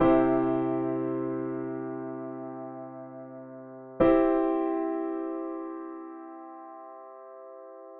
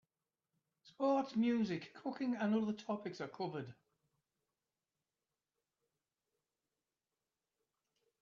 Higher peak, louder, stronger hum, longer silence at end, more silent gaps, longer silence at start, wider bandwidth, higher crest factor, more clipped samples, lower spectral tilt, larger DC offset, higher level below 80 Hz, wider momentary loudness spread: first, -10 dBFS vs -26 dBFS; first, -29 LUFS vs -39 LUFS; neither; second, 0 s vs 4.5 s; neither; second, 0 s vs 0.85 s; second, 4 kHz vs 7.2 kHz; about the same, 18 dB vs 18 dB; neither; first, -7.5 dB/octave vs -5.5 dB/octave; neither; first, -54 dBFS vs -86 dBFS; first, 22 LU vs 11 LU